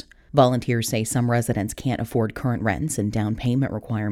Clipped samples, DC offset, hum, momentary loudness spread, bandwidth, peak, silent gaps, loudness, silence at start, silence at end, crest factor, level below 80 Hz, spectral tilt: under 0.1%; under 0.1%; none; 6 LU; 16 kHz; -4 dBFS; none; -23 LUFS; 0.35 s; 0 s; 18 dB; -46 dBFS; -6 dB/octave